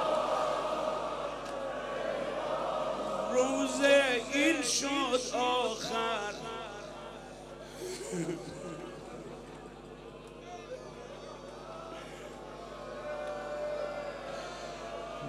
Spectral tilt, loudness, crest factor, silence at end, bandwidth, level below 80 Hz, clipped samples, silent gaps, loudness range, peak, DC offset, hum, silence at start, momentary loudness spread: -3 dB/octave; -33 LUFS; 22 dB; 0 s; 15 kHz; -60 dBFS; under 0.1%; none; 17 LU; -12 dBFS; under 0.1%; none; 0 s; 18 LU